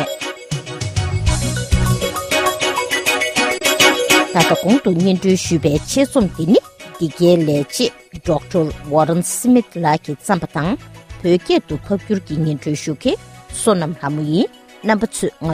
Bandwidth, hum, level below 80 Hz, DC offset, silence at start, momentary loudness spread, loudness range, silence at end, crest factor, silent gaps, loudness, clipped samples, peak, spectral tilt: 15.5 kHz; none; -34 dBFS; under 0.1%; 0 s; 10 LU; 5 LU; 0 s; 16 dB; none; -17 LUFS; under 0.1%; 0 dBFS; -4.5 dB/octave